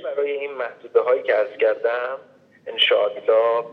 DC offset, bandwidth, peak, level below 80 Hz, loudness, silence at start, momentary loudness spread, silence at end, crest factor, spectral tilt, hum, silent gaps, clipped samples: under 0.1%; 5.4 kHz; -4 dBFS; under -90 dBFS; -21 LUFS; 0 s; 13 LU; 0 s; 16 dB; -3.5 dB/octave; none; none; under 0.1%